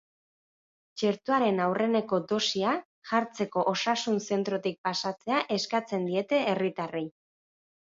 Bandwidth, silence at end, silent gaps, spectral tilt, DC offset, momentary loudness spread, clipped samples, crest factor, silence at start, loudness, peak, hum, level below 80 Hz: 7.8 kHz; 0.85 s; 2.85-3.02 s, 4.78-4.84 s; -4.5 dB/octave; under 0.1%; 5 LU; under 0.1%; 18 dB; 0.95 s; -29 LUFS; -12 dBFS; none; -76 dBFS